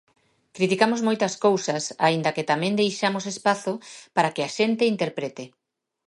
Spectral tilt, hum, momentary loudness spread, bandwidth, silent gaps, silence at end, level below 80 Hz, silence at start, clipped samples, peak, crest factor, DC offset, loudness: -4.5 dB/octave; none; 10 LU; 11.5 kHz; none; 0.6 s; -74 dBFS; 0.55 s; under 0.1%; -4 dBFS; 20 dB; under 0.1%; -24 LUFS